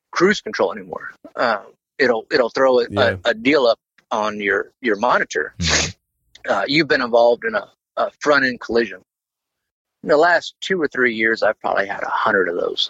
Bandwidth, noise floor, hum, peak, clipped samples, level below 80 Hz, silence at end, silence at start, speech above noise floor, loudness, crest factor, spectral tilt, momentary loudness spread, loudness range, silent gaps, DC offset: 8.2 kHz; -83 dBFS; none; -4 dBFS; under 0.1%; -48 dBFS; 0 s; 0.15 s; 65 dB; -18 LUFS; 16 dB; -3.5 dB/octave; 9 LU; 2 LU; 9.71-9.85 s; under 0.1%